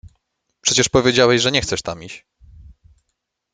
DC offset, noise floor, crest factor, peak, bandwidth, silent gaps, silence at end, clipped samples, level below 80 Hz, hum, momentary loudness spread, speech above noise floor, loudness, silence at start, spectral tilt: under 0.1%; -76 dBFS; 20 dB; 0 dBFS; 9.6 kHz; none; 1.35 s; under 0.1%; -46 dBFS; none; 20 LU; 58 dB; -16 LUFS; 0.05 s; -3 dB/octave